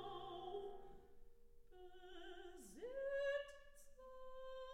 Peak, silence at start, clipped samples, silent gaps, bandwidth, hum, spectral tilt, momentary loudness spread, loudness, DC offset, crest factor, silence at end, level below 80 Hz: -34 dBFS; 0 s; under 0.1%; none; 16 kHz; none; -3.5 dB/octave; 20 LU; -50 LUFS; under 0.1%; 16 dB; 0 s; -66 dBFS